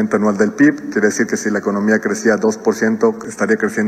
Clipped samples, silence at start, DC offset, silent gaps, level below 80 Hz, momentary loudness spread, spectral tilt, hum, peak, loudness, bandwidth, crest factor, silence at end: under 0.1%; 0 s; under 0.1%; none; -58 dBFS; 4 LU; -5.5 dB/octave; none; -2 dBFS; -16 LUFS; 14 kHz; 14 dB; 0 s